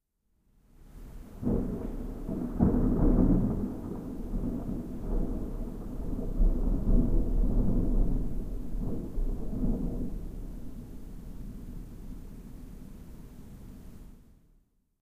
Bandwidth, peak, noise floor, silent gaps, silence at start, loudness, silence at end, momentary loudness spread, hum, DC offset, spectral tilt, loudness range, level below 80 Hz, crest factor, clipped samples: 2.2 kHz; -10 dBFS; -72 dBFS; none; 0.8 s; -32 LUFS; 0.85 s; 22 LU; none; under 0.1%; -10 dB/octave; 17 LU; -32 dBFS; 20 dB; under 0.1%